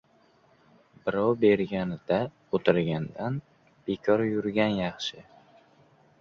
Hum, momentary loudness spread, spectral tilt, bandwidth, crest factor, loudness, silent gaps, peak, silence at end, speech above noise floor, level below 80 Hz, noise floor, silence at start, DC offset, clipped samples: none; 12 LU; -7 dB/octave; 7.4 kHz; 22 dB; -27 LUFS; none; -6 dBFS; 1 s; 36 dB; -60 dBFS; -62 dBFS; 1.05 s; under 0.1%; under 0.1%